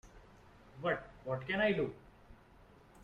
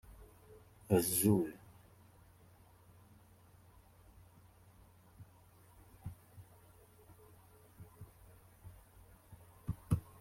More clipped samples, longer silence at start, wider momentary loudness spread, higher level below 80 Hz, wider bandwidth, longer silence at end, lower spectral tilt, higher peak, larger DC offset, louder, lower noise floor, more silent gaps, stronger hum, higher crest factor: neither; about the same, 0.05 s vs 0.1 s; second, 17 LU vs 30 LU; about the same, -62 dBFS vs -62 dBFS; second, 10.5 kHz vs 16.5 kHz; second, 0 s vs 0.2 s; first, -7 dB/octave vs -5.5 dB/octave; second, -20 dBFS vs -16 dBFS; neither; about the same, -36 LUFS vs -35 LUFS; about the same, -61 dBFS vs -63 dBFS; neither; neither; second, 20 dB vs 26 dB